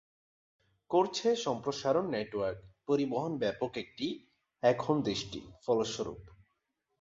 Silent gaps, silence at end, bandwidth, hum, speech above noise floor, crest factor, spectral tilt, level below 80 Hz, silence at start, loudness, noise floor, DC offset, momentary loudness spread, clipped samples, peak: none; 0.75 s; 8 kHz; none; 50 dB; 20 dB; -5 dB/octave; -64 dBFS; 0.9 s; -33 LUFS; -82 dBFS; under 0.1%; 10 LU; under 0.1%; -14 dBFS